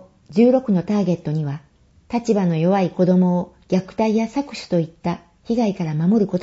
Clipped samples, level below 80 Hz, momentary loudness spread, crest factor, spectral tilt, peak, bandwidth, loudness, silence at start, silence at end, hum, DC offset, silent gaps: under 0.1%; -54 dBFS; 11 LU; 16 dB; -8 dB/octave; -4 dBFS; 8 kHz; -20 LUFS; 0.3 s; 0 s; none; under 0.1%; none